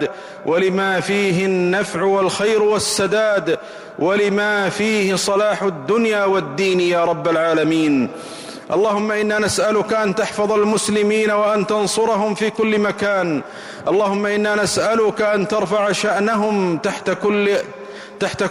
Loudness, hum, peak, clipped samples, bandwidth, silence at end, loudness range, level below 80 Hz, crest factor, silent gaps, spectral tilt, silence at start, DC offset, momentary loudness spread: -18 LUFS; none; -8 dBFS; under 0.1%; 15.5 kHz; 0 s; 1 LU; -56 dBFS; 8 dB; none; -4.5 dB/octave; 0 s; under 0.1%; 6 LU